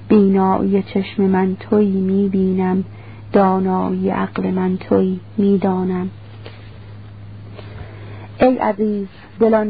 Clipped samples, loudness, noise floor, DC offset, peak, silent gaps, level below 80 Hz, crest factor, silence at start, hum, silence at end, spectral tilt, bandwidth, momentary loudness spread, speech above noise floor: under 0.1%; -17 LUFS; -36 dBFS; 0.5%; -2 dBFS; none; -46 dBFS; 16 dB; 0 s; none; 0 s; -13.5 dB/octave; 4.9 kHz; 21 LU; 20 dB